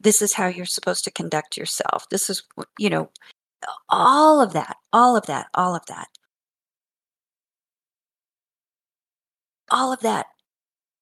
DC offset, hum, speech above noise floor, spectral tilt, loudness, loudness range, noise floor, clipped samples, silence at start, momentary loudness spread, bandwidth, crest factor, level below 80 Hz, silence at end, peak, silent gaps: under 0.1%; none; over 69 dB; -3 dB/octave; -20 LUFS; 11 LU; under -90 dBFS; under 0.1%; 0.05 s; 20 LU; 16 kHz; 22 dB; -74 dBFS; 0.8 s; -2 dBFS; 8.81-8.85 s